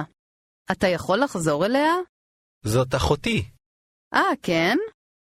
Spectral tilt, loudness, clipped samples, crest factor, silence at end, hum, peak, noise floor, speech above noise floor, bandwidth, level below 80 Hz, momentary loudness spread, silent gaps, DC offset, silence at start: -5 dB/octave; -23 LUFS; under 0.1%; 18 dB; 0.45 s; none; -6 dBFS; under -90 dBFS; over 68 dB; 15.5 kHz; -46 dBFS; 13 LU; 0.19-0.65 s, 2.09-2.61 s, 3.66-4.11 s; under 0.1%; 0 s